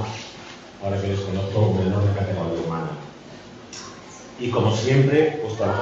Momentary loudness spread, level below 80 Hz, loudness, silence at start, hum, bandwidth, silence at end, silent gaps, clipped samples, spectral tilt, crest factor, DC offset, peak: 21 LU; -54 dBFS; -22 LUFS; 0 s; none; 7.8 kHz; 0 s; none; under 0.1%; -7 dB/octave; 16 dB; under 0.1%; -8 dBFS